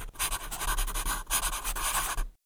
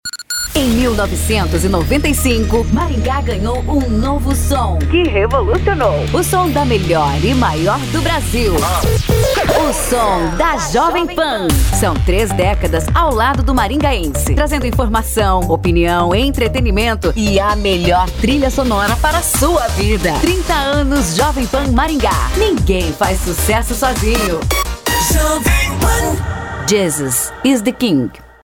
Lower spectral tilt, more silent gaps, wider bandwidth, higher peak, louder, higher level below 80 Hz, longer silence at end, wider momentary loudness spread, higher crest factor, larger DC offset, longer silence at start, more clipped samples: second, -0.5 dB/octave vs -4.5 dB/octave; neither; about the same, over 20 kHz vs over 20 kHz; second, -12 dBFS vs 0 dBFS; second, -31 LUFS vs -14 LUFS; second, -36 dBFS vs -20 dBFS; about the same, 0.15 s vs 0.2 s; about the same, 4 LU vs 3 LU; about the same, 18 dB vs 14 dB; neither; about the same, 0 s vs 0.05 s; neither